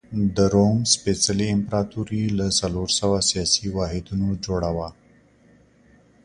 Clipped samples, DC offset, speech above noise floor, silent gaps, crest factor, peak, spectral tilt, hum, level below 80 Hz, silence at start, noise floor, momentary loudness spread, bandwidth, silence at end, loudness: under 0.1%; under 0.1%; 33 dB; none; 20 dB; -4 dBFS; -4.5 dB/octave; none; -42 dBFS; 0.1 s; -55 dBFS; 8 LU; 11 kHz; 1.35 s; -22 LUFS